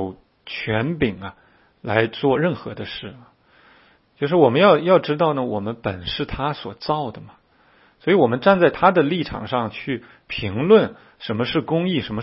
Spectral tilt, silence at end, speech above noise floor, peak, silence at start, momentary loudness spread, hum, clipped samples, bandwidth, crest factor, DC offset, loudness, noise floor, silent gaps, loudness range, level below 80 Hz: -10.5 dB/octave; 0 s; 36 dB; 0 dBFS; 0 s; 15 LU; none; under 0.1%; 5.8 kHz; 20 dB; under 0.1%; -20 LUFS; -56 dBFS; none; 5 LU; -50 dBFS